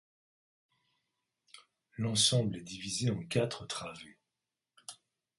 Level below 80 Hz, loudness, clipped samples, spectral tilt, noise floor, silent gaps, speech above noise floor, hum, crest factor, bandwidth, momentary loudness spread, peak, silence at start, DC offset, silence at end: -66 dBFS; -32 LUFS; under 0.1%; -4 dB/octave; -90 dBFS; none; 56 dB; none; 22 dB; 11.5 kHz; 23 LU; -14 dBFS; 1.55 s; under 0.1%; 0.45 s